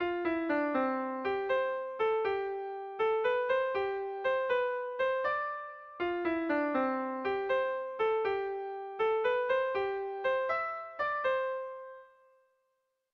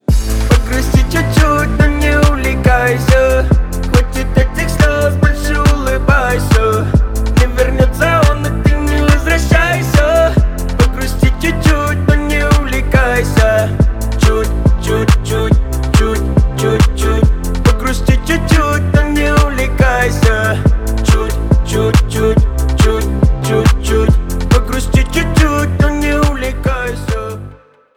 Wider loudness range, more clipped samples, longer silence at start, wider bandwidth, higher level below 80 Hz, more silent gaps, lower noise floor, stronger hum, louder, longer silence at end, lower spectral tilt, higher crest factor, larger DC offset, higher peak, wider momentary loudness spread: about the same, 1 LU vs 1 LU; neither; about the same, 0 s vs 0.1 s; second, 6 kHz vs 16.5 kHz; second, -70 dBFS vs -14 dBFS; neither; first, -80 dBFS vs -37 dBFS; neither; second, -32 LUFS vs -13 LUFS; first, 1.1 s vs 0.4 s; about the same, -6 dB/octave vs -6 dB/octave; about the same, 14 dB vs 12 dB; neither; second, -18 dBFS vs 0 dBFS; first, 7 LU vs 3 LU